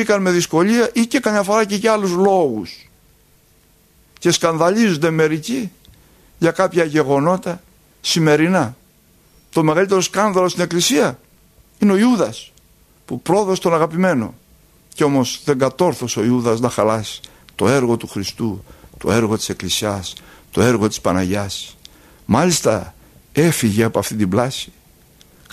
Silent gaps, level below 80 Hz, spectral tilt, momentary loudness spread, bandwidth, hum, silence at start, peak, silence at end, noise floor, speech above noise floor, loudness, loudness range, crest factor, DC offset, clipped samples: none; -50 dBFS; -5 dB/octave; 12 LU; 15 kHz; none; 0 s; 0 dBFS; 0.85 s; -54 dBFS; 37 dB; -17 LUFS; 3 LU; 18 dB; under 0.1%; under 0.1%